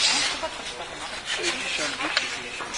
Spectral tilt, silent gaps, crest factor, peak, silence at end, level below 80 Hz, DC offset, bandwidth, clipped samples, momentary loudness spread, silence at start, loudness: 0 dB/octave; none; 22 dB; -6 dBFS; 0 s; -56 dBFS; under 0.1%; 11 kHz; under 0.1%; 10 LU; 0 s; -26 LUFS